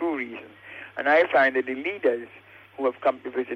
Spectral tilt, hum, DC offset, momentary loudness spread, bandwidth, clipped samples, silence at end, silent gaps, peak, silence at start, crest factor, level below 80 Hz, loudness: -5.5 dB/octave; none; under 0.1%; 21 LU; 6.4 kHz; under 0.1%; 0 s; none; -10 dBFS; 0 s; 16 dB; -72 dBFS; -24 LUFS